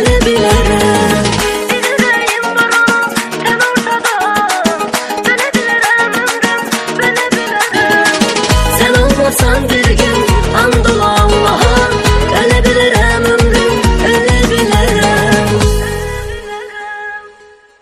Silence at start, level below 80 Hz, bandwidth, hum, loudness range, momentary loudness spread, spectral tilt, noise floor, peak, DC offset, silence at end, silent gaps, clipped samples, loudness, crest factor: 0 s; -20 dBFS; 15.5 kHz; none; 2 LU; 6 LU; -4 dB/octave; -41 dBFS; 0 dBFS; under 0.1%; 0.5 s; none; under 0.1%; -10 LUFS; 10 dB